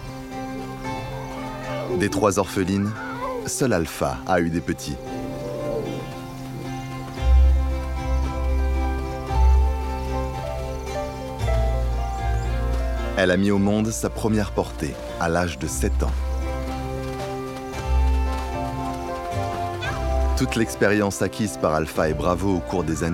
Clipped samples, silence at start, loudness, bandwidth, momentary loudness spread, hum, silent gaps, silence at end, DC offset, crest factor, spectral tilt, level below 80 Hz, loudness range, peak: under 0.1%; 0 s; -24 LUFS; 15.5 kHz; 11 LU; none; none; 0 s; under 0.1%; 18 dB; -6 dB/octave; -26 dBFS; 4 LU; -4 dBFS